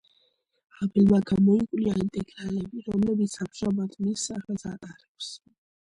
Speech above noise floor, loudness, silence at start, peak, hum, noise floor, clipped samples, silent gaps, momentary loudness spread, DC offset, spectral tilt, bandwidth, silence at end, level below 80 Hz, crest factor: 43 dB; -26 LUFS; 0.8 s; -10 dBFS; none; -69 dBFS; under 0.1%; 5.08-5.15 s; 17 LU; under 0.1%; -6.5 dB/octave; 11 kHz; 0.45 s; -54 dBFS; 18 dB